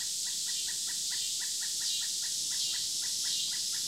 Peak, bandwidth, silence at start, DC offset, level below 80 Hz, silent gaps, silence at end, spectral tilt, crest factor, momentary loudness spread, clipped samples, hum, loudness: -20 dBFS; 16 kHz; 0 s; under 0.1%; -74 dBFS; none; 0 s; 3 dB/octave; 14 dB; 2 LU; under 0.1%; none; -30 LUFS